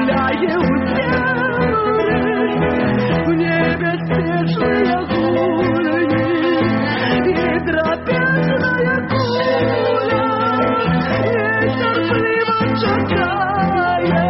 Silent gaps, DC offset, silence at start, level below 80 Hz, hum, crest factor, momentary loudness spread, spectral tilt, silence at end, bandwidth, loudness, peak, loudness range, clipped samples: none; under 0.1%; 0 s; -40 dBFS; none; 10 dB; 1 LU; -5 dB/octave; 0 s; 5.8 kHz; -16 LUFS; -6 dBFS; 0 LU; under 0.1%